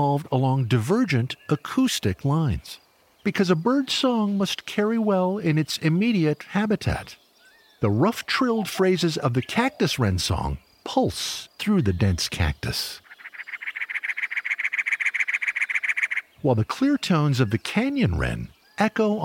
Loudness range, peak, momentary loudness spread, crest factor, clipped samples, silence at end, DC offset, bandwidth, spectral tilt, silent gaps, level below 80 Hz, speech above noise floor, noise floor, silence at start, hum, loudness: 3 LU; -6 dBFS; 8 LU; 18 dB; under 0.1%; 0 s; under 0.1%; 17 kHz; -5.5 dB/octave; none; -44 dBFS; 33 dB; -56 dBFS; 0 s; none; -24 LUFS